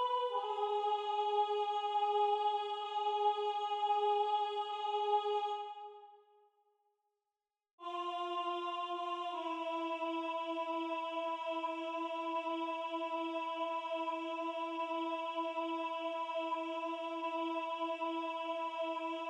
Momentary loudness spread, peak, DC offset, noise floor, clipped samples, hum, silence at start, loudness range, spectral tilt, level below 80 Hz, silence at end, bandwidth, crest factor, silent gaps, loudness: 6 LU; -22 dBFS; under 0.1%; under -90 dBFS; under 0.1%; none; 0 s; 7 LU; -1.5 dB/octave; under -90 dBFS; 0 s; 9.6 kHz; 16 dB; 7.73-7.78 s; -37 LUFS